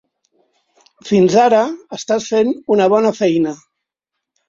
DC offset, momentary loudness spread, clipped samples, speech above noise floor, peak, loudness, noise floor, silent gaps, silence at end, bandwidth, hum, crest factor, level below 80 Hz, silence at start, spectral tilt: under 0.1%; 12 LU; under 0.1%; 66 dB; 0 dBFS; -15 LUFS; -80 dBFS; none; 0.95 s; 7.6 kHz; none; 16 dB; -60 dBFS; 1.05 s; -5.5 dB/octave